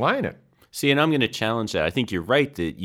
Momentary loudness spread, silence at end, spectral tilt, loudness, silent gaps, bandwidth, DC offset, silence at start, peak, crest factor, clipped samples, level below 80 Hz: 7 LU; 0 s; -5 dB/octave; -23 LUFS; none; 17 kHz; under 0.1%; 0 s; -6 dBFS; 18 dB; under 0.1%; -52 dBFS